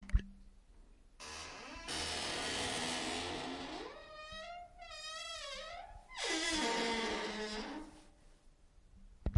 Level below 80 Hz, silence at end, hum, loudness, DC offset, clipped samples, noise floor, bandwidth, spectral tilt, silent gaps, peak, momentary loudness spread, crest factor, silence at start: -50 dBFS; 0 s; none; -40 LUFS; under 0.1%; under 0.1%; -63 dBFS; 11.5 kHz; -3 dB/octave; none; -18 dBFS; 15 LU; 24 dB; 0 s